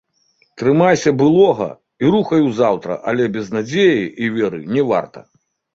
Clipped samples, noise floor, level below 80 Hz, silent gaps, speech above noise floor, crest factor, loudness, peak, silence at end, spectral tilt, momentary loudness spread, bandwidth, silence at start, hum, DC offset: under 0.1%; -60 dBFS; -56 dBFS; none; 45 dB; 16 dB; -16 LUFS; -2 dBFS; 0.55 s; -6.5 dB/octave; 8 LU; 7.8 kHz; 0.55 s; none; under 0.1%